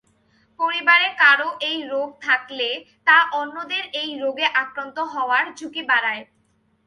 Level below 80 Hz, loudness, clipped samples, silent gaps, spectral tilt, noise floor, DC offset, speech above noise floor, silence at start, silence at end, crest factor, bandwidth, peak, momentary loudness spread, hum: -74 dBFS; -20 LUFS; under 0.1%; none; -1.5 dB/octave; -64 dBFS; under 0.1%; 43 dB; 0.6 s; 0.65 s; 20 dB; 11 kHz; -2 dBFS; 12 LU; none